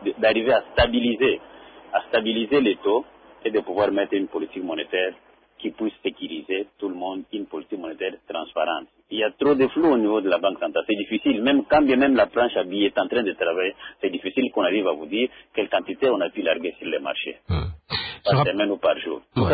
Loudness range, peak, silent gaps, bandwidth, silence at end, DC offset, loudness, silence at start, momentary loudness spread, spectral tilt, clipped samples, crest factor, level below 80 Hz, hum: 8 LU; -6 dBFS; none; 5 kHz; 0 s; under 0.1%; -23 LUFS; 0 s; 11 LU; -10.5 dB/octave; under 0.1%; 16 dB; -44 dBFS; none